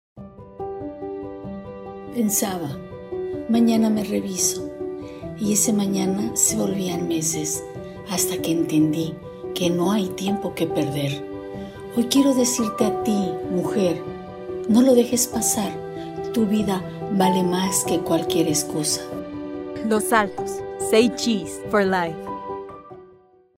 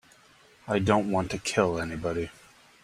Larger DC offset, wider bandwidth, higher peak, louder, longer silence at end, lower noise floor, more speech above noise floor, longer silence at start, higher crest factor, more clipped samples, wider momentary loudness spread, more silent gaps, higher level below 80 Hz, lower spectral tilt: neither; first, 16 kHz vs 14 kHz; first, -2 dBFS vs -6 dBFS; first, -22 LUFS vs -28 LUFS; about the same, 0.5 s vs 0.55 s; second, -53 dBFS vs -58 dBFS; about the same, 32 dB vs 31 dB; second, 0.15 s vs 0.65 s; about the same, 20 dB vs 22 dB; neither; first, 15 LU vs 10 LU; neither; about the same, -54 dBFS vs -54 dBFS; second, -4 dB/octave vs -5.5 dB/octave